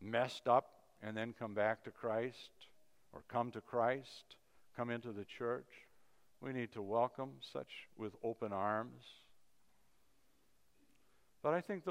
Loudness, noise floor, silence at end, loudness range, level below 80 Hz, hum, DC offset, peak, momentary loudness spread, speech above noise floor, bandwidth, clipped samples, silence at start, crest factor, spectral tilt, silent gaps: -41 LUFS; -78 dBFS; 0 s; 5 LU; -84 dBFS; none; under 0.1%; -20 dBFS; 18 LU; 37 dB; 15.5 kHz; under 0.1%; 0 s; 24 dB; -6 dB/octave; none